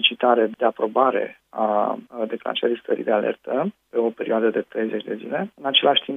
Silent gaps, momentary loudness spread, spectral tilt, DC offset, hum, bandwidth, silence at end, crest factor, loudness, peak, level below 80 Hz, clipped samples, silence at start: none; 10 LU; -6.5 dB/octave; under 0.1%; none; 3.9 kHz; 0 s; 20 dB; -22 LUFS; -2 dBFS; -76 dBFS; under 0.1%; 0 s